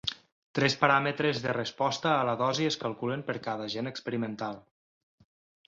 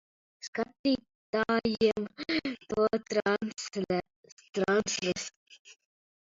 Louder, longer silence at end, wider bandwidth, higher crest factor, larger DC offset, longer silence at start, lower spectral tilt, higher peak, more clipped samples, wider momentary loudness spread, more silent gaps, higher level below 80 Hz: about the same, -29 LUFS vs -31 LUFS; first, 1.05 s vs 0.55 s; about the same, 8 kHz vs 7.8 kHz; about the same, 22 dB vs 18 dB; neither; second, 0.05 s vs 0.45 s; about the same, -4.5 dB/octave vs -4 dB/octave; first, -8 dBFS vs -14 dBFS; neither; first, 12 LU vs 8 LU; second, 0.32-0.54 s vs 0.48-0.53 s, 0.79-0.84 s, 1.15-1.33 s, 4.16-4.24 s, 4.32-4.37 s, 5.36-5.46 s, 5.59-5.65 s; about the same, -68 dBFS vs -64 dBFS